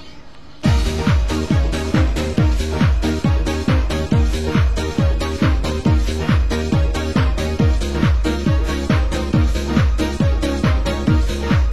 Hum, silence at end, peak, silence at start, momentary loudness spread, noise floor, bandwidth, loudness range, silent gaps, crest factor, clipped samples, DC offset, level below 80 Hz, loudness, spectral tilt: none; 0 s; -4 dBFS; 0 s; 1 LU; -40 dBFS; 12.5 kHz; 0 LU; none; 14 dB; under 0.1%; 2%; -20 dBFS; -18 LUFS; -6.5 dB/octave